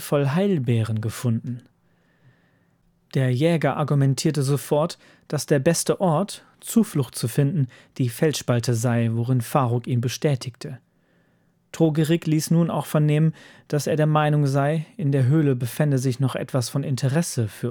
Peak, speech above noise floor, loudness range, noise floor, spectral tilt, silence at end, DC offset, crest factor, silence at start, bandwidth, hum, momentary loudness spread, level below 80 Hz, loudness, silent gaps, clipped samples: -4 dBFS; 42 dB; 3 LU; -63 dBFS; -6.5 dB/octave; 0 s; under 0.1%; 18 dB; 0 s; over 20 kHz; none; 9 LU; -66 dBFS; -22 LUFS; none; under 0.1%